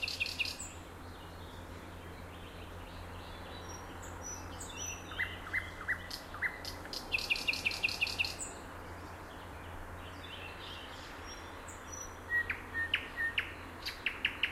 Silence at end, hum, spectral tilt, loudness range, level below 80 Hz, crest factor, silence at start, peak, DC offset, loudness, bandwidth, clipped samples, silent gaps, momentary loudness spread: 0 s; none; -2 dB/octave; 11 LU; -54 dBFS; 22 dB; 0 s; -18 dBFS; under 0.1%; -38 LUFS; 16 kHz; under 0.1%; none; 15 LU